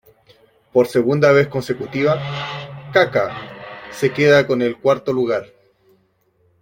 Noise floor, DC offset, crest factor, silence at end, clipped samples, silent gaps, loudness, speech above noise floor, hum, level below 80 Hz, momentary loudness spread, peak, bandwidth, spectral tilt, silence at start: -61 dBFS; under 0.1%; 18 dB; 1.15 s; under 0.1%; none; -18 LUFS; 45 dB; none; -56 dBFS; 15 LU; -2 dBFS; 16.5 kHz; -6 dB/octave; 0.75 s